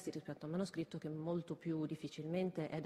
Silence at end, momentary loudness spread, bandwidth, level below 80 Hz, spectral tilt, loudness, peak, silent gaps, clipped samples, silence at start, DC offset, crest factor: 0 s; 5 LU; 13 kHz; -78 dBFS; -7 dB/octave; -43 LUFS; -28 dBFS; none; under 0.1%; 0 s; under 0.1%; 14 dB